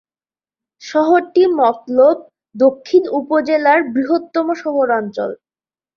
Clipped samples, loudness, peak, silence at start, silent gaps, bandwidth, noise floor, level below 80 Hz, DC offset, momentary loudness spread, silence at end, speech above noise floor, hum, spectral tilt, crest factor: under 0.1%; -15 LUFS; -2 dBFS; 0.8 s; none; 7 kHz; under -90 dBFS; -64 dBFS; under 0.1%; 9 LU; 0.6 s; over 75 dB; none; -5.5 dB/octave; 14 dB